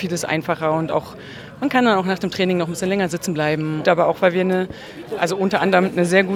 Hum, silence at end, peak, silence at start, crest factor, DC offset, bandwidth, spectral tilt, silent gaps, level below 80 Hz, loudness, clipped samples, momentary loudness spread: none; 0 s; 0 dBFS; 0 s; 20 dB; under 0.1%; 15.5 kHz; -5.5 dB/octave; none; -56 dBFS; -19 LUFS; under 0.1%; 10 LU